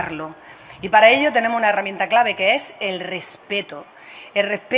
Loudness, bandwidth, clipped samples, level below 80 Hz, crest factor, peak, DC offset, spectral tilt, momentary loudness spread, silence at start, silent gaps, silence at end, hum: -18 LUFS; 4 kHz; under 0.1%; -62 dBFS; 20 dB; 0 dBFS; under 0.1%; -7 dB/octave; 20 LU; 0 s; none; 0 s; none